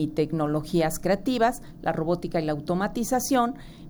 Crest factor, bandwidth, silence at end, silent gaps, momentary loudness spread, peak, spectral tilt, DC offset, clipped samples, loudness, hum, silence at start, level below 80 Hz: 16 dB; over 20 kHz; 0 s; none; 5 LU; -10 dBFS; -5.5 dB/octave; under 0.1%; under 0.1%; -26 LUFS; none; 0 s; -46 dBFS